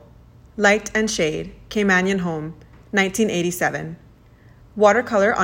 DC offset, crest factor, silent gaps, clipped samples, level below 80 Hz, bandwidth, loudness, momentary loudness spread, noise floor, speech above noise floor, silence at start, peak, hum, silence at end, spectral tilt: under 0.1%; 20 dB; none; under 0.1%; -50 dBFS; 16.5 kHz; -20 LUFS; 14 LU; -49 dBFS; 29 dB; 0.55 s; -2 dBFS; none; 0 s; -4.5 dB/octave